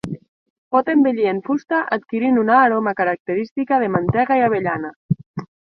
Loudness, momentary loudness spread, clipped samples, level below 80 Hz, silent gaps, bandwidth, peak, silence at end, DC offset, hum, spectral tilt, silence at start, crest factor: -19 LUFS; 10 LU; under 0.1%; -52 dBFS; 0.28-0.71 s, 3.20-3.25 s, 3.51-3.56 s, 4.96-5.09 s, 5.26-5.34 s; 6.2 kHz; -2 dBFS; 0.15 s; under 0.1%; none; -9 dB/octave; 0.05 s; 16 dB